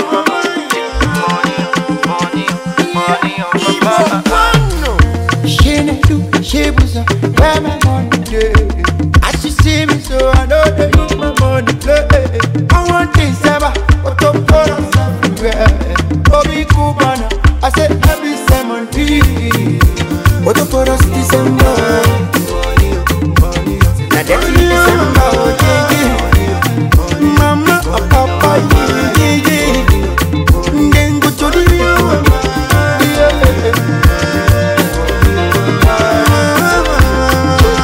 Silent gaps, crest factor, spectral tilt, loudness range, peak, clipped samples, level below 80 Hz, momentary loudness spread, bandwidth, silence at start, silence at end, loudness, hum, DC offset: none; 10 dB; -5.5 dB/octave; 2 LU; 0 dBFS; under 0.1%; -16 dBFS; 4 LU; 16.5 kHz; 0 s; 0 s; -11 LUFS; none; under 0.1%